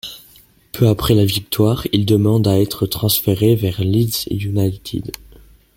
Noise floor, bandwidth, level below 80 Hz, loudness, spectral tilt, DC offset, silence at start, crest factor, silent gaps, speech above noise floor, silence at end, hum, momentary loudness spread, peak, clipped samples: -49 dBFS; 17 kHz; -40 dBFS; -17 LUFS; -6 dB/octave; under 0.1%; 0.05 s; 16 dB; none; 33 dB; 0.65 s; none; 12 LU; -2 dBFS; under 0.1%